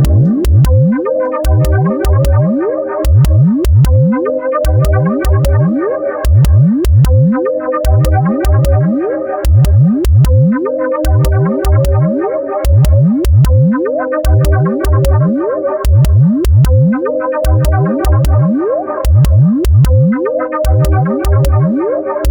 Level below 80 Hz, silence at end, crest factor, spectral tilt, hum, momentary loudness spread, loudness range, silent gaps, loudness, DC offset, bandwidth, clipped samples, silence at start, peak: -16 dBFS; 0 s; 8 dB; -8.5 dB/octave; none; 6 LU; 0 LU; none; -11 LUFS; under 0.1%; over 20 kHz; under 0.1%; 0 s; 0 dBFS